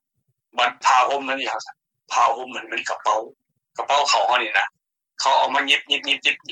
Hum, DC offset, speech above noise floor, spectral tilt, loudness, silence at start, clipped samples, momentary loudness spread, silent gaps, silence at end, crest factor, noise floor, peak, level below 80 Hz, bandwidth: none; under 0.1%; 53 dB; 0.5 dB/octave; -20 LUFS; 0.55 s; under 0.1%; 13 LU; none; 0 s; 18 dB; -74 dBFS; -4 dBFS; -78 dBFS; 12.5 kHz